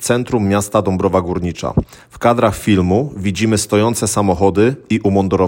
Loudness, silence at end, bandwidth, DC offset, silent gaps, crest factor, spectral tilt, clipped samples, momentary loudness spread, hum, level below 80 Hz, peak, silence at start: -16 LUFS; 0 s; 17 kHz; under 0.1%; none; 14 dB; -5.5 dB/octave; under 0.1%; 6 LU; none; -40 dBFS; 0 dBFS; 0 s